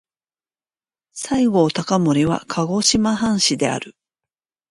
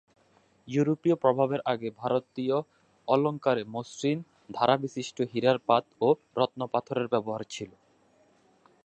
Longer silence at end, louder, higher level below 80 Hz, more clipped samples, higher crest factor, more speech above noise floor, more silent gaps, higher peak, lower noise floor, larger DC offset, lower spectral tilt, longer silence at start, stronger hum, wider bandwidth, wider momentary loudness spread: second, 0.8 s vs 1.15 s; first, -18 LUFS vs -28 LUFS; first, -50 dBFS vs -74 dBFS; neither; about the same, 18 dB vs 20 dB; first, over 72 dB vs 37 dB; neither; first, -2 dBFS vs -8 dBFS; first, under -90 dBFS vs -65 dBFS; neither; second, -4 dB/octave vs -6 dB/octave; first, 1.15 s vs 0.65 s; neither; first, 11.5 kHz vs 8.8 kHz; about the same, 12 LU vs 10 LU